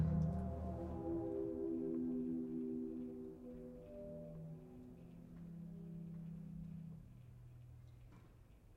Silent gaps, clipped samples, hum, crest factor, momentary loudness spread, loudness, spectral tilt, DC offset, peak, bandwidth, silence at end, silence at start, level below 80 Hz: none; under 0.1%; none; 20 dB; 18 LU; -46 LUFS; -11 dB/octave; under 0.1%; -26 dBFS; 6.2 kHz; 0 s; 0 s; -60 dBFS